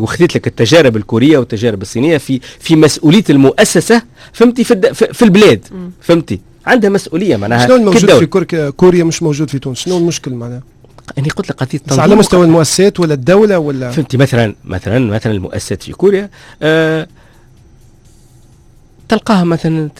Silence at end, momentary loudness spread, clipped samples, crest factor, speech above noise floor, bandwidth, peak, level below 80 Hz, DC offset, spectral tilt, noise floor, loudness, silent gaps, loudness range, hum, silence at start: 0.1 s; 12 LU; 0.5%; 10 dB; 32 dB; 16 kHz; 0 dBFS; -40 dBFS; under 0.1%; -5.5 dB/octave; -42 dBFS; -10 LUFS; none; 7 LU; none; 0 s